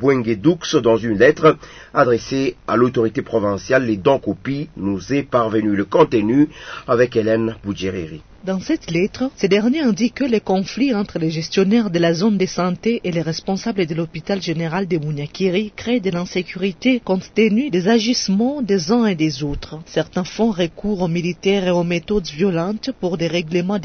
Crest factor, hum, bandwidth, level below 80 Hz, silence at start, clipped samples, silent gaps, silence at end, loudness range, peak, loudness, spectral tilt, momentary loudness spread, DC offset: 16 dB; none; 6.6 kHz; -46 dBFS; 0 s; under 0.1%; none; 0 s; 4 LU; -2 dBFS; -19 LUFS; -6 dB/octave; 8 LU; under 0.1%